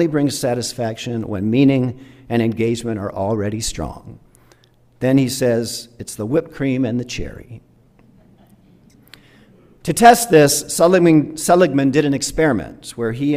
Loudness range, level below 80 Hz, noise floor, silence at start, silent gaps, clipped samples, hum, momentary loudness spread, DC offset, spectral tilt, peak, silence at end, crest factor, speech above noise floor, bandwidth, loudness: 11 LU; -44 dBFS; -52 dBFS; 0 s; none; under 0.1%; none; 17 LU; under 0.1%; -5 dB/octave; 0 dBFS; 0 s; 18 dB; 36 dB; 16 kHz; -17 LUFS